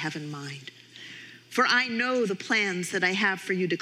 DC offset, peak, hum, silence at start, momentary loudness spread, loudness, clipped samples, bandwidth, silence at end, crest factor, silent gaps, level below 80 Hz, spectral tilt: under 0.1%; -10 dBFS; none; 0 s; 20 LU; -26 LUFS; under 0.1%; 16 kHz; 0 s; 18 dB; none; -82 dBFS; -3.5 dB/octave